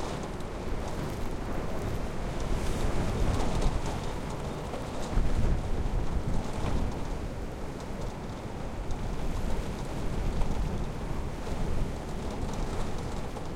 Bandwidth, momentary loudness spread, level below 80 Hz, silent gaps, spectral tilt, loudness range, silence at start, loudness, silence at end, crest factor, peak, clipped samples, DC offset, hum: 13.5 kHz; 7 LU; -34 dBFS; none; -6 dB/octave; 3 LU; 0 s; -35 LUFS; 0 s; 16 dB; -14 dBFS; under 0.1%; under 0.1%; none